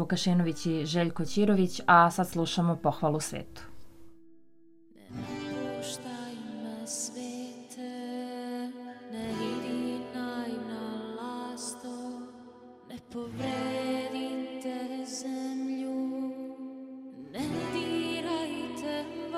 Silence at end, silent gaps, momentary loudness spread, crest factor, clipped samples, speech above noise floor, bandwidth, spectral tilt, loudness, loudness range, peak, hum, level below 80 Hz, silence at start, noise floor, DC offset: 0 s; none; 16 LU; 26 dB; under 0.1%; 34 dB; 16 kHz; -5 dB/octave; -32 LUFS; 12 LU; -6 dBFS; none; -64 dBFS; 0 s; -61 dBFS; under 0.1%